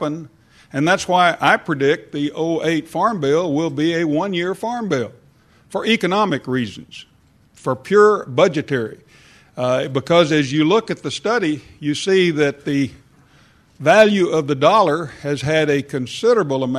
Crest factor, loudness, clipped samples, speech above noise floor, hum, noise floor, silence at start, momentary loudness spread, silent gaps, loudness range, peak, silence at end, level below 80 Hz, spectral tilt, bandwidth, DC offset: 18 dB; -18 LUFS; under 0.1%; 35 dB; none; -52 dBFS; 0 s; 11 LU; none; 4 LU; 0 dBFS; 0 s; -58 dBFS; -5.5 dB/octave; 13 kHz; under 0.1%